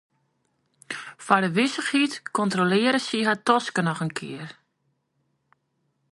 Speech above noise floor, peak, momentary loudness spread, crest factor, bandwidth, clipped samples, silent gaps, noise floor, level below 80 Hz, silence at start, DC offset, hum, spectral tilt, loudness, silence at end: 50 dB; -2 dBFS; 15 LU; 24 dB; 11.5 kHz; under 0.1%; none; -73 dBFS; -72 dBFS; 0.9 s; under 0.1%; none; -4.5 dB/octave; -23 LUFS; 1.6 s